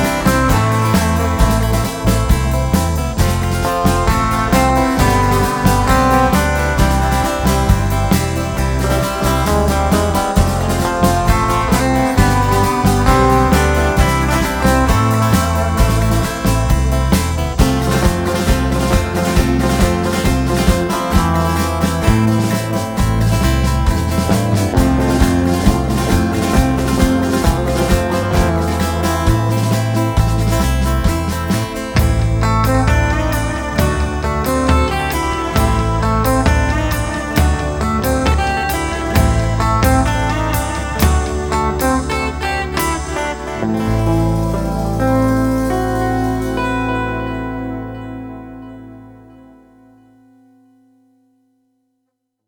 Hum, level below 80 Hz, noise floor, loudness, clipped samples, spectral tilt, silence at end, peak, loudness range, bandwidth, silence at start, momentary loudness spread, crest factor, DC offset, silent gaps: none; -20 dBFS; -72 dBFS; -15 LUFS; under 0.1%; -5.5 dB/octave; 3.3 s; 0 dBFS; 4 LU; over 20 kHz; 0 s; 5 LU; 14 dB; under 0.1%; none